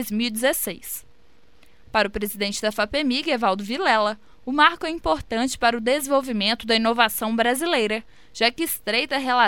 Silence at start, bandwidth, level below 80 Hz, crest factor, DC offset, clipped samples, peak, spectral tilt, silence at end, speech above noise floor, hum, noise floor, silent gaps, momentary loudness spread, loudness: 0 s; 17.5 kHz; -48 dBFS; 22 dB; 0.5%; under 0.1%; -2 dBFS; -2.5 dB/octave; 0 s; 36 dB; none; -59 dBFS; none; 8 LU; -22 LUFS